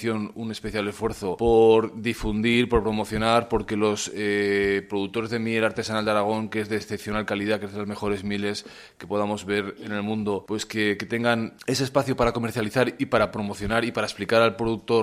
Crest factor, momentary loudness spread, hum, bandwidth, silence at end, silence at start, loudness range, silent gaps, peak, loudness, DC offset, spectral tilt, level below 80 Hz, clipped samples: 20 dB; 8 LU; none; 15 kHz; 0 s; 0 s; 6 LU; none; -4 dBFS; -25 LUFS; under 0.1%; -5 dB/octave; -46 dBFS; under 0.1%